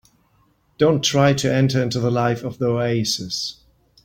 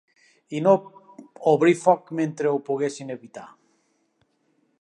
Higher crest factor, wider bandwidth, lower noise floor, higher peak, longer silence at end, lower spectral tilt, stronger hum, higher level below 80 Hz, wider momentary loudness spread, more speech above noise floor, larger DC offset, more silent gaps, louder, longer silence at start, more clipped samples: about the same, 18 dB vs 22 dB; first, 16.5 kHz vs 11 kHz; second, -61 dBFS vs -69 dBFS; about the same, -4 dBFS vs -4 dBFS; second, 0.55 s vs 1.35 s; second, -5 dB/octave vs -6.5 dB/octave; neither; first, -54 dBFS vs -78 dBFS; second, 7 LU vs 18 LU; second, 42 dB vs 47 dB; neither; neither; about the same, -20 LUFS vs -22 LUFS; first, 0.8 s vs 0.5 s; neither